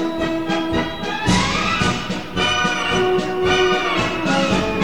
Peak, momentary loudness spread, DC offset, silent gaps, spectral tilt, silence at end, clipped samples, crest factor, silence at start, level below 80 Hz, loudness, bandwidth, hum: -4 dBFS; 5 LU; 1%; none; -4.5 dB/octave; 0 s; under 0.1%; 14 dB; 0 s; -38 dBFS; -19 LUFS; 18 kHz; none